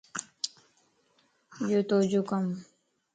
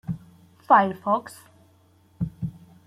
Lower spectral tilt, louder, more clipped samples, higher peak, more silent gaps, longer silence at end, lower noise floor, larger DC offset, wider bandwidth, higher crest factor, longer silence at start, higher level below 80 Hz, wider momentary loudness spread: second, -5.5 dB/octave vs -7 dB/octave; second, -30 LUFS vs -24 LUFS; neither; second, -14 dBFS vs -2 dBFS; neither; first, 0.5 s vs 0.35 s; first, -69 dBFS vs -58 dBFS; neither; second, 9.4 kHz vs 15.5 kHz; second, 18 dB vs 24 dB; about the same, 0.15 s vs 0.1 s; second, -76 dBFS vs -54 dBFS; second, 12 LU vs 17 LU